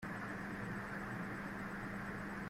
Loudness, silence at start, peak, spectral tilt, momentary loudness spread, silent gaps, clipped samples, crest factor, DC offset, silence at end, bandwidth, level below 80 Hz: -44 LUFS; 0 s; -32 dBFS; -6.5 dB/octave; 1 LU; none; under 0.1%; 12 dB; under 0.1%; 0 s; 16 kHz; -62 dBFS